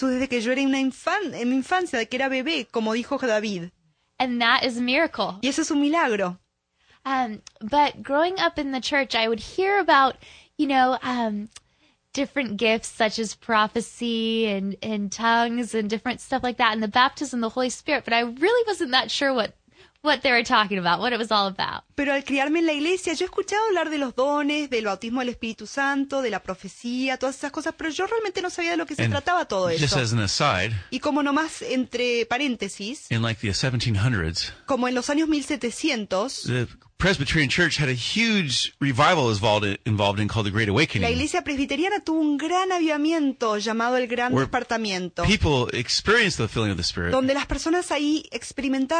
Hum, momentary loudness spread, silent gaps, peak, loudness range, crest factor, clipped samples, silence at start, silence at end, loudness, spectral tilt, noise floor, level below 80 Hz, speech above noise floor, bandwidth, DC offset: none; 8 LU; none; -6 dBFS; 3 LU; 18 dB; under 0.1%; 0 s; 0 s; -23 LUFS; -4.5 dB/octave; -64 dBFS; -48 dBFS; 41 dB; 10 kHz; under 0.1%